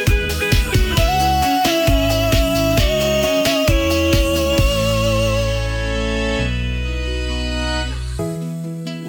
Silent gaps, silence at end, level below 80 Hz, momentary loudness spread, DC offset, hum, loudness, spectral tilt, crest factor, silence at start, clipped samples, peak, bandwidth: none; 0 s; -22 dBFS; 8 LU; under 0.1%; none; -18 LUFS; -5 dB/octave; 12 dB; 0 s; under 0.1%; -4 dBFS; 19 kHz